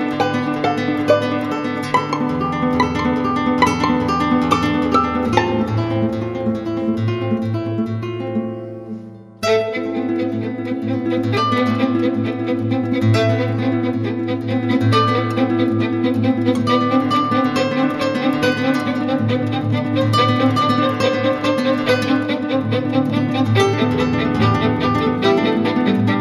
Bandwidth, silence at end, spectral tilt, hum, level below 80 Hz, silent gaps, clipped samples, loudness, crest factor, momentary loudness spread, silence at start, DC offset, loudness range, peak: 13 kHz; 0 s; -6.5 dB/octave; none; -46 dBFS; none; under 0.1%; -18 LUFS; 16 dB; 6 LU; 0 s; under 0.1%; 5 LU; 0 dBFS